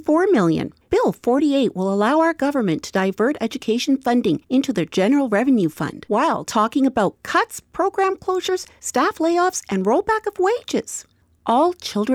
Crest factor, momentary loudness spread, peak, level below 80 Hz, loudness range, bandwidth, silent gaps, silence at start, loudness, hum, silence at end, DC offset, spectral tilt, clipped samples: 14 dB; 7 LU; -6 dBFS; -54 dBFS; 2 LU; 17 kHz; none; 0.05 s; -20 LUFS; none; 0 s; under 0.1%; -5 dB/octave; under 0.1%